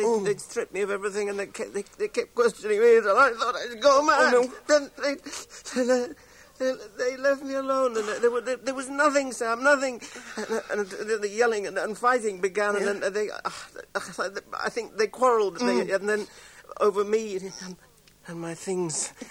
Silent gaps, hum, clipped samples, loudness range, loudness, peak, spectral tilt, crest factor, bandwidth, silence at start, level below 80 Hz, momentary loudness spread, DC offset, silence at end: none; none; under 0.1%; 6 LU; -25 LUFS; -8 dBFS; -3 dB/octave; 18 dB; 16 kHz; 0 s; -66 dBFS; 14 LU; under 0.1%; 0 s